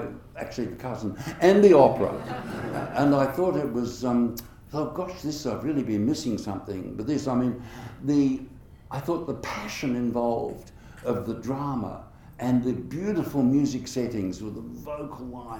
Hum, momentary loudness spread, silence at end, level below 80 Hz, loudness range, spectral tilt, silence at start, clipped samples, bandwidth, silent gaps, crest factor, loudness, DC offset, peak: none; 14 LU; 0 s; -52 dBFS; 8 LU; -6.5 dB/octave; 0 s; under 0.1%; 18 kHz; none; 22 dB; -26 LUFS; under 0.1%; -4 dBFS